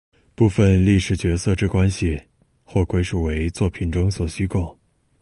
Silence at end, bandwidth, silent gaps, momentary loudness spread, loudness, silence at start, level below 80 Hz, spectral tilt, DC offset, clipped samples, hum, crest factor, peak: 0.5 s; 11.5 kHz; none; 9 LU; -21 LUFS; 0.4 s; -30 dBFS; -7 dB/octave; under 0.1%; under 0.1%; none; 14 dB; -6 dBFS